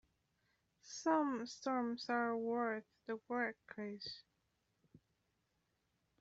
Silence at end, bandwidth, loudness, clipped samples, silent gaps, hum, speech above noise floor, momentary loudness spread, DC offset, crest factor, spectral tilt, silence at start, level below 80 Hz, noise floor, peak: 2 s; 8 kHz; -41 LUFS; under 0.1%; none; none; 43 dB; 12 LU; under 0.1%; 22 dB; -2.5 dB/octave; 0.85 s; -84 dBFS; -83 dBFS; -22 dBFS